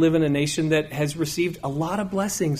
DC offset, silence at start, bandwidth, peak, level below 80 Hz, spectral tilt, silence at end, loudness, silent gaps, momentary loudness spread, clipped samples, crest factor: under 0.1%; 0 s; 15.5 kHz; -10 dBFS; -52 dBFS; -5.5 dB/octave; 0 s; -24 LUFS; none; 5 LU; under 0.1%; 14 dB